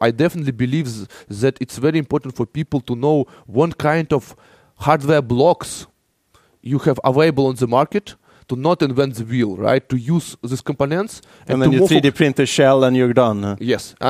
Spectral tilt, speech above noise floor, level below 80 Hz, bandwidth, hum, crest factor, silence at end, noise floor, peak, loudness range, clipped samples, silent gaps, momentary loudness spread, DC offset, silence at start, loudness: -6.5 dB/octave; 41 dB; -50 dBFS; 15.5 kHz; none; 18 dB; 0 s; -58 dBFS; 0 dBFS; 4 LU; under 0.1%; none; 11 LU; under 0.1%; 0 s; -18 LUFS